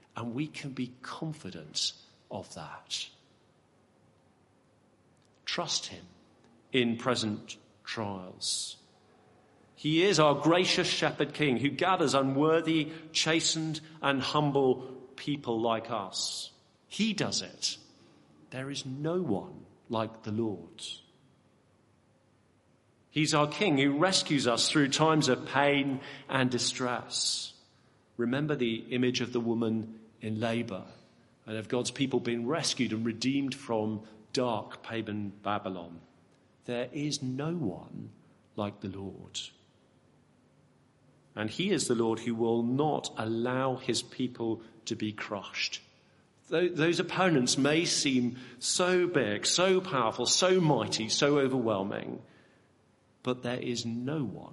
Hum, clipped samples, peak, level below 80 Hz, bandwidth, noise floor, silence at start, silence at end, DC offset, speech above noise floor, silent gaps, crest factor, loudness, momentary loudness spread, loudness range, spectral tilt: none; under 0.1%; -8 dBFS; -72 dBFS; 11.5 kHz; -66 dBFS; 0.15 s; 0 s; under 0.1%; 36 dB; none; 24 dB; -30 LUFS; 15 LU; 11 LU; -4 dB/octave